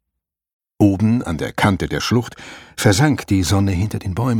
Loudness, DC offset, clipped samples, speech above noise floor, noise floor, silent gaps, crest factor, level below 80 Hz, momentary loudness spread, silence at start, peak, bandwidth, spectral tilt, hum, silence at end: -18 LUFS; under 0.1%; under 0.1%; 63 dB; -80 dBFS; none; 16 dB; -40 dBFS; 9 LU; 0.8 s; -2 dBFS; 17 kHz; -5.5 dB/octave; none; 0 s